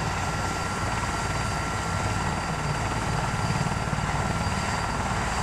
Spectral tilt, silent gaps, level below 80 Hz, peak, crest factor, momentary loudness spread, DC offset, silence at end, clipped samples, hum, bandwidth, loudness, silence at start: -4.5 dB/octave; none; -36 dBFS; -12 dBFS; 14 dB; 1 LU; under 0.1%; 0 s; under 0.1%; none; 15 kHz; -27 LUFS; 0 s